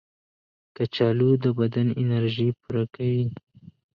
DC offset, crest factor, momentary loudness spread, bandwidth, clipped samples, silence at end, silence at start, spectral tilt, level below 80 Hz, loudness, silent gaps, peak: under 0.1%; 16 dB; 9 LU; 5.6 kHz; under 0.1%; 0.6 s; 0.8 s; -10 dB/octave; -60 dBFS; -24 LUFS; none; -8 dBFS